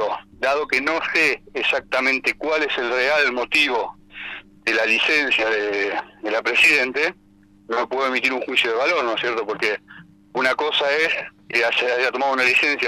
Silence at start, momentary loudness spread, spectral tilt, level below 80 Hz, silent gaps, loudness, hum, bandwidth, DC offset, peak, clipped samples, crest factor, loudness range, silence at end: 0 s; 10 LU; -2 dB/octave; -58 dBFS; none; -19 LUFS; 50 Hz at -55 dBFS; 16 kHz; under 0.1%; -8 dBFS; under 0.1%; 14 dB; 3 LU; 0 s